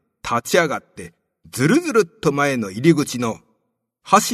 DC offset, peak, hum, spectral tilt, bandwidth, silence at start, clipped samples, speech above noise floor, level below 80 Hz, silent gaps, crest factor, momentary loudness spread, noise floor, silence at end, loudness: under 0.1%; 0 dBFS; none; -5 dB/octave; 13.5 kHz; 0.25 s; under 0.1%; 54 dB; -56 dBFS; none; 20 dB; 15 LU; -72 dBFS; 0 s; -19 LUFS